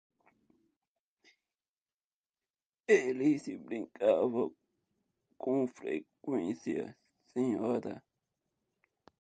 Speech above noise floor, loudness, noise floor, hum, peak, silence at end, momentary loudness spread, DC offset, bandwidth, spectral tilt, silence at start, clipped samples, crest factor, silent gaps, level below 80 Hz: over 58 dB; -33 LUFS; under -90 dBFS; none; -14 dBFS; 1.2 s; 13 LU; under 0.1%; 9.2 kHz; -6.5 dB/octave; 2.9 s; under 0.1%; 22 dB; none; -80 dBFS